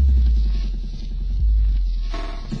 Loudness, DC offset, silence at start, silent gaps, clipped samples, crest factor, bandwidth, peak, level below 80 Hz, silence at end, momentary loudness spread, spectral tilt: -24 LUFS; under 0.1%; 0 s; none; under 0.1%; 10 dB; 6 kHz; -10 dBFS; -20 dBFS; 0 s; 12 LU; -7.5 dB/octave